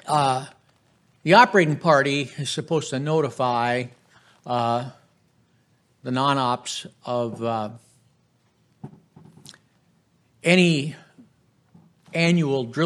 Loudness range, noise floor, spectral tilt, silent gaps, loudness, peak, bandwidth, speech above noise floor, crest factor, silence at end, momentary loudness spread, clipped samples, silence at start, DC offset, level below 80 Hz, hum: 11 LU; -64 dBFS; -5.5 dB/octave; none; -22 LUFS; -2 dBFS; 12 kHz; 43 dB; 22 dB; 0 s; 14 LU; under 0.1%; 0.05 s; under 0.1%; -72 dBFS; none